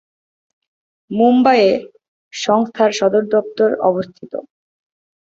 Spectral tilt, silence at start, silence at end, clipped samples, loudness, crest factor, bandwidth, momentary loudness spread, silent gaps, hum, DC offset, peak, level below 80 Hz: -5 dB/octave; 1.1 s; 0.95 s; under 0.1%; -15 LUFS; 16 dB; 7.8 kHz; 17 LU; 2.08-2.31 s; none; under 0.1%; -2 dBFS; -64 dBFS